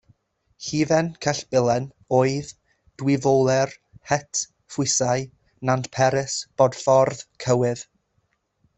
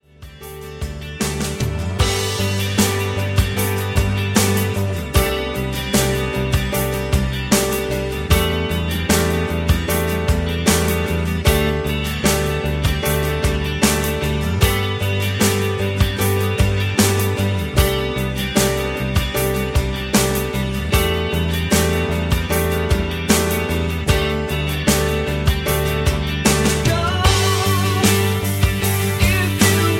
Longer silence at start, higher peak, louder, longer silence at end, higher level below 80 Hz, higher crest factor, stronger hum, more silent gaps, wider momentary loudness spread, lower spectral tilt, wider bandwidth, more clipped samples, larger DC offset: first, 0.6 s vs 0.2 s; second, -4 dBFS vs 0 dBFS; second, -22 LUFS vs -18 LUFS; first, 0.95 s vs 0 s; second, -58 dBFS vs -26 dBFS; about the same, 20 dB vs 18 dB; neither; neither; first, 11 LU vs 5 LU; about the same, -4.5 dB/octave vs -4.5 dB/octave; second, 8.4 kHz vs 17 kHz; neither; neither